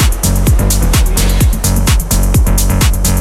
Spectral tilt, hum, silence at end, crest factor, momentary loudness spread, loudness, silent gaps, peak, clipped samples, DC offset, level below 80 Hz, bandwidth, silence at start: -4.5 dB/octave; none; 0 s; 8 dB; 1 LU; -12 LUFS; none; 0 dBFS; under 0.1%; under 0.1%; -12 dBFS; 16.5 kHz; 0 s